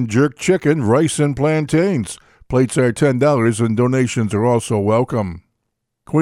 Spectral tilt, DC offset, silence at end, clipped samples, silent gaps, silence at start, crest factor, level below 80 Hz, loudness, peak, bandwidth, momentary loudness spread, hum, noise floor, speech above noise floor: -6.5 dB/octave; under 0.1%; 0 s; under 0.1%; none; 0 s; 16 dB; -46 dBFS; -17 LUFS; -2 dBFS; 13.5 kHz; 6 LU; none; -75 dBFS; 59 dB